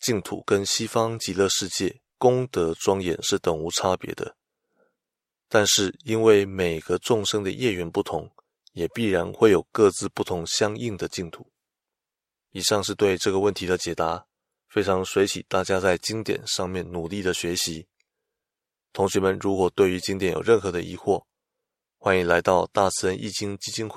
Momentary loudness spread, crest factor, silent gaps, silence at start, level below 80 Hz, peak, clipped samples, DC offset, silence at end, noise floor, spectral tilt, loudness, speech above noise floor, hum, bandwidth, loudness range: 10 LU; 22 dB; none; 0 s; -56 dBFS; -4 dBFS; under 0.1%; under 0.1%; 0 s; -89 dBFS; -4 dB/octave; -24 LUFS; 65 dB; none; 15.5 kHz; 4 LU